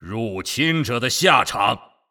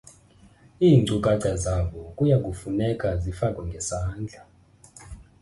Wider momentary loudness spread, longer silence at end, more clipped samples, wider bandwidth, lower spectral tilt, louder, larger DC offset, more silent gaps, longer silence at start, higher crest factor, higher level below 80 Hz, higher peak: second, 11 LU vs 14 LU; about the same, 0.3 s vs 0.2 s; neither; first, over 20 kHz vs 11.5 kHz; second, -3.5 dB/octave vs -6.5 dB/octave; first, -19 LUFS vs -24 LUFS; neither; neither; second, 0 s vs 0.8 s; about the same, 20 dB vs 18 dB; second, -54 dBFS vs -40 dBFS; first, 0 dBFS vs -6 dBFS